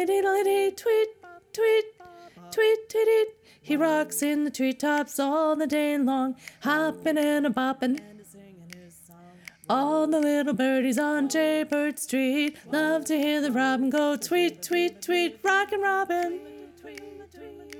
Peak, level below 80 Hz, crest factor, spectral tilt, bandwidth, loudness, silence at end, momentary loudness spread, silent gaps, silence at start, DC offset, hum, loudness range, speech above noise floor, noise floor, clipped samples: -10 dBFS; -72 dBFS; 16 dB; -3.5 dB/octave; 18 kHz; -25 LUFS; 0 s; 9 LU; none; 0 s; under 0.1%; none; 3 LU; 26 dB; -51 dBFS; under 0.1%